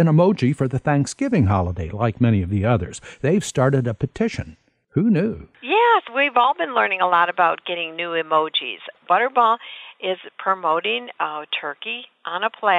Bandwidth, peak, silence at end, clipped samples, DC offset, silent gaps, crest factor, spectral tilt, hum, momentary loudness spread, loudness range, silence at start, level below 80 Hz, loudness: 11.5 kHz; -2 dBFS; 0 s; under 0.1%; under 0.1%; none; 18 dB; -6 dB/octave; none; 10 LU; 3 LU; 0 s; -48 dBFS; -20 LUFS